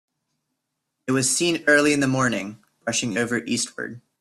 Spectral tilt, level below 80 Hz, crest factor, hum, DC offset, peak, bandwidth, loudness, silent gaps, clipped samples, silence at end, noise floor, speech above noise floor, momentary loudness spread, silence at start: -3.5 dB/octave; -62 dBFS; 18 dB; none; under 0.1%; -4 dBFS; 14 kHz; -21 LUFS; none; under 0.1%; 0.2 s; -79 dBFS; 57 dB; 16 LU; 1.05 s